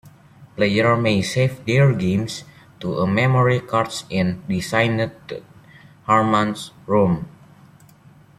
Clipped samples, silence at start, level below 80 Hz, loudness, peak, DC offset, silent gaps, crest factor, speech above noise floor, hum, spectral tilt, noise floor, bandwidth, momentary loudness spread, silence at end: under 0.1%; 0.05 s; -54 dBFS; -20 LUFS; -4 dBFS; under 0.1%; none; 18 dB; 30 dB; none; -6.5 dB/octave; -49 dBFS; 13 kHz; 16 LU; 1.1 s